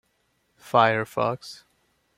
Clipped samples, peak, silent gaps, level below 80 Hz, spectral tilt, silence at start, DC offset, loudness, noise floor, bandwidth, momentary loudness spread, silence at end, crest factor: under 0.1%; -2 dBFS; none; -68 dBFS; -5.5 dB/octave; 0.65 s; under 0.1%; -23 LUFS; -70 dBFS; 16 kHz; 16 LU; 0.65 s; 24 dB